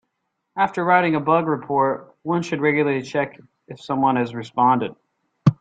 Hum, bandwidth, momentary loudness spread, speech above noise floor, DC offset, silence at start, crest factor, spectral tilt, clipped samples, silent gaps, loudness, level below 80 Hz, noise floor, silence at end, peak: none; 9 kHz; 11 LU; 55 dB; under 0.1%; 0.55 s; 20 dB; -7.5 dB/octave; under 0.1%; none; -21 LUFS; -60 dBFS; -76 dBFS; 0.05 s; -2 dBFS